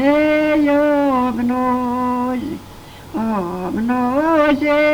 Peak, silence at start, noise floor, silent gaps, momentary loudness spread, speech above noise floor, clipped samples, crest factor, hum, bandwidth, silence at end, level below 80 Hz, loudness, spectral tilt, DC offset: -2 dBFS; 0 s; -37 dBFS; none; 9 LU; 20 dB; under 0.1%; 16 dB; none; over 20 kHz; 0 s; -44 dBFS; -17 LUFS; -6.5 dB/octave; under 0.1%